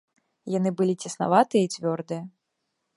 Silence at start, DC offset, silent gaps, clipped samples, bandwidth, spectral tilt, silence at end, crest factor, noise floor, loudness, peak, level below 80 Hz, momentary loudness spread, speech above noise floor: 0.45 s; under 0.1%; none; under 0.1%; 11.5 kHz; -6 dB/octave; 0.7 s; 22 dB; -79 dBFS; -25 LUFS; -4 dBFS; -74 dBFS; 15 LU; 55 dB